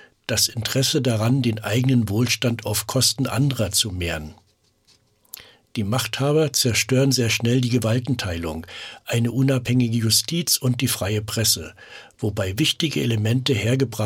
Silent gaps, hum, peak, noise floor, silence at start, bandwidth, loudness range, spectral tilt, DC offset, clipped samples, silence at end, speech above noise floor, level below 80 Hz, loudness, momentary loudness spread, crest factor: none; none; -6 dBFS; -61 dBFS; 0.3 s; 17 kHz; 3 LU; -4 dB/octave; under 0.1%; under 0.1%; 0 s; 39 dB; -50 dBFS; -21 LUFS; 11 LU; 16 dB